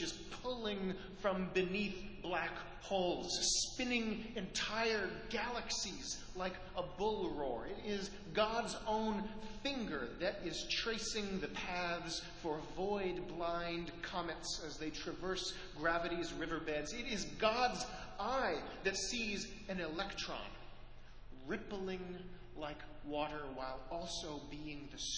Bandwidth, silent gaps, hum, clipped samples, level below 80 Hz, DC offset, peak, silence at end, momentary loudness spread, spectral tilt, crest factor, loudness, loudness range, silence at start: 8 kHz; none; none; under 0.1%; -58 dBFS; under 0.1%; -18 dBFS; 0 s; 10 LU; -3 dB/octave; 22 dB; -40 LUFS; 7 LU; 0 s